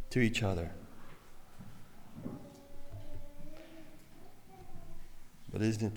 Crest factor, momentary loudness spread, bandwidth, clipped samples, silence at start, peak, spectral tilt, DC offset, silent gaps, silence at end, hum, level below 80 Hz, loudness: 22 dB; 25 LU; 19.5 kHz; under 0.1%; 0 s; -16 dBFS; -6 dB/octave; under 0.1%; none; 0 s; none; -50 dBFS; -37 LUFS